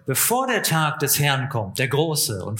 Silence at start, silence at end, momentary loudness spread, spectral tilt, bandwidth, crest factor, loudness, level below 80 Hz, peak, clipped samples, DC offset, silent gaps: 0.05 s; 0 s; 5 LU; -3.5 dB/octave; 17 kHz; 18 dB; -20 LUFS; -60 dBFS; -4 dBFS; under 0.1%; under 0.1%; none